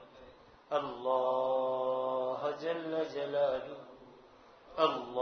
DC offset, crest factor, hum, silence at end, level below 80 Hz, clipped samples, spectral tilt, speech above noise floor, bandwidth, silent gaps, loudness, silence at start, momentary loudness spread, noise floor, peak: under 0.1%; 20 dB; none; 0 s; -72 dBFS; under 0.1%; -2.5 dB/octave; 25 dB; 6.4 kHz; none; -34 LUFS; 0 s; 9 LU; -58 dBFS; -14 dBFS